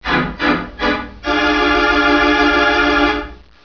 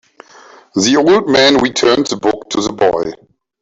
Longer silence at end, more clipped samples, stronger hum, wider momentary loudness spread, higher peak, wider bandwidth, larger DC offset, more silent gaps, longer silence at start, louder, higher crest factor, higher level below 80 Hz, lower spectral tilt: second, 0.3 s vs 0.45 s; neither; neither; second, 7 LU vs 10 LU; about the same, -2 dBFS vs 0 dBFS; second, 5.4 kHz vs 8 kHz; first, 0.3% vs under 0.1%; neither; second, 0.05 s vs 0.75 s; about the same, -14 LUFS vs -12 LUFS; about the same, 14 dB vs 14 dB; first, -32 dBFS vs -48 dBFS; first, -5 dB/octave vs -3.5 dB/octave